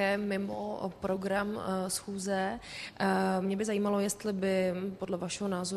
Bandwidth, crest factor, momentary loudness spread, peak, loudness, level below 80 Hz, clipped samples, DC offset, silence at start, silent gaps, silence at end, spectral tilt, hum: 13.5 kHz; 16 dB; 7 LU; -16 dBFS; -33 LUFS; -64 dBFS; under 0.1%; under 0.1%; 0 s; none; 0 s; -5 dB/octave; none